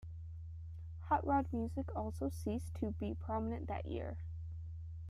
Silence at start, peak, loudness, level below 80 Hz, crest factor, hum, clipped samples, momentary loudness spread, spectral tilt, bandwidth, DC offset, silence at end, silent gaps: 0 s; -22 dBFS; -41 LUFS; -52 dBFS; 18 dB; none; under 0.1%; 14 LU; -8 dB/octave; 13 kHz; under 0.1%; 0 s; none